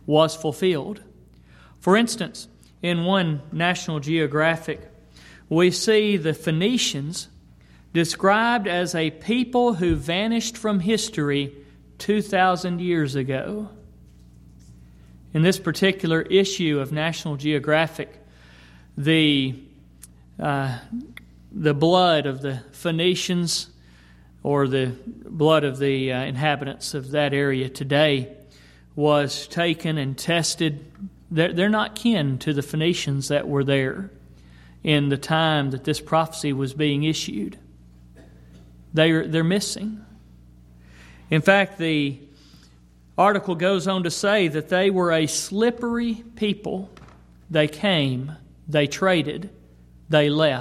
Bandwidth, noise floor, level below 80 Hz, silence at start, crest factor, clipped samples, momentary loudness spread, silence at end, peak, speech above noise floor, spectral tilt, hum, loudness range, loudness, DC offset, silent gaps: 14.5 kHz; -52 dBFS; -52 dBFS; 0.05 s; 22 dB; under 0.1%; 13 LU; 0 s; -2 dBFS; 30 dB; -5 dB/octave; 60 Hz at -50 dBFS; 3 LU; -22 LUFS; under 0.1%; none